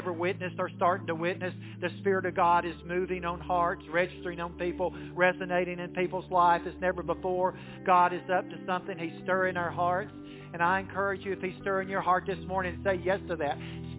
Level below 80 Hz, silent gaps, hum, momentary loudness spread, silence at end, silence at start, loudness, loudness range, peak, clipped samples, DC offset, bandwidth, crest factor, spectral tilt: -54 dBFS; none; none; 9 LU; 0 s; 0 s; -30 LUFS; 2 LU; -10 dBFS; under 0.1%; under 0.1%; 4 kHz; 20 dB; -4.5 dB/octave